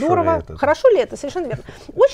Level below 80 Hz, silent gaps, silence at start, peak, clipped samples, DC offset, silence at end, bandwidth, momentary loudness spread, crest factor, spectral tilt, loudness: -44 dBFS; none; 0 s; -4 dBFS; under 0.1%; under 0.1%; 0 s; 10.5 kHz; 14 LU; 14 dB; -6 dB/octave; -18 LUFS